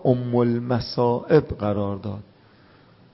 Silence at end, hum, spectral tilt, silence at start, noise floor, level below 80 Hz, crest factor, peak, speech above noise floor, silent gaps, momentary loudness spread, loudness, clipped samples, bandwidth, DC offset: 0.9 s; none; -11 dB/octave; 0 s; -53 dBFS; -48 dBFS; 18 dB; -4 dBFS; 31 dB; none; 12 LU; -22 LUFS; under 0.1%; 5.8 kHz; under 0.1%